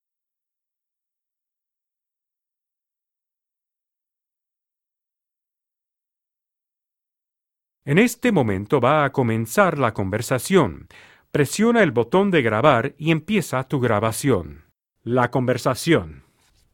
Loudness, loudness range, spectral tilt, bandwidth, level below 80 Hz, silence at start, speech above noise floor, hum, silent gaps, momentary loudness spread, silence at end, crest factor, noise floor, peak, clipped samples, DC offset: -20 LUFS; 4 LU; -6 dB/octave; 17.5 kHz; -54 dBFS; 7.85 s; 68 dB; none; none; 7 LU; 0.55 s; 22 dB; -87 dBFS; 0 dBFS; under 0.1%; under 0.1%